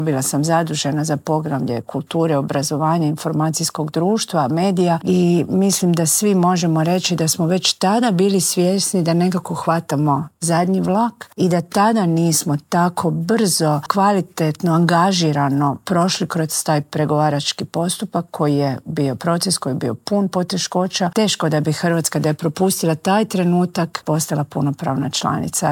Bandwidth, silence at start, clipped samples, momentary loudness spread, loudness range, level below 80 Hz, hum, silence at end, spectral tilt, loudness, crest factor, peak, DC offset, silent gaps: 17.5 kHz; 0 s; under 0.1%; 5 LU; 3 LU; -60 dBFS; none; 0 s; -5 dB/octave; -18 LUFS; 16 dB; -2 dBFS; under 0.1%; none